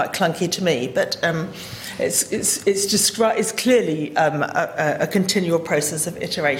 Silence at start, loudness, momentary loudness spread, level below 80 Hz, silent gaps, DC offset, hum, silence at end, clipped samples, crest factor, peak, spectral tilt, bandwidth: 0 s; -20 LUFS; 6 LU; -58 dBFS; none; under 0.1%; none; 0 s; under 0.1%; 14 dB; -6 dBFS; -3 dB/octave; 16.5 kHz